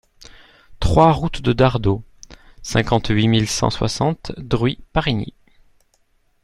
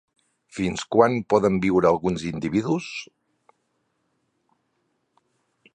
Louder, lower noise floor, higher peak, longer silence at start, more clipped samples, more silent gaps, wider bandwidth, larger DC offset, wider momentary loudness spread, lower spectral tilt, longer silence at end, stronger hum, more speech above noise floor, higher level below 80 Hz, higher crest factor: first, -19 LUFS vs -22 LUFS; second, -61 dBFS vs -73 dBFS; first, 0 dBFS vs -4 dBFS; first, 0.7 s vs 0.55 s; neither; neither; first, 12.5 kHz vs 10.5 kHz; neither; about the same, 11 LU vs 11 LU; about the same, -5.5 dB/octave vs -6.5 dB/octave; second, 1.15 s vs 2.7 s; neither; second, 43 dB vs 51 dB; first, -34 dBFS vs -54 dBFS; about the same, 18 dB vs 22 dB